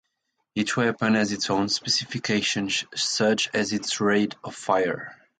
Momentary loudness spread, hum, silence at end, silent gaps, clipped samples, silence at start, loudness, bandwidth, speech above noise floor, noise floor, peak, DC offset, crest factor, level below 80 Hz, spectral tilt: 7 LU; none; 0.25 s; none; under 0.1%; 0.55 s; -24 LUFS; 9.4 kHz; 52 dB; -77 dBFS; -8 dBFS; under 0.1%; 18 dB; -62 dBFS; -3.5 dB/octave